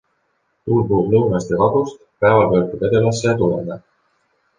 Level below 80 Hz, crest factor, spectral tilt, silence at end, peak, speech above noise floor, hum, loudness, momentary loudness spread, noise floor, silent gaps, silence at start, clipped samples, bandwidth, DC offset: -46 dBFS; 16 dB; -7 dB/octave; 0.8 s; -2 dBFS; 51 dB; none; -17 LUFS; 12 LU; -67 dBFS; none; 0.65 s; under 0.1%; 9.6 kHz; under 0.1%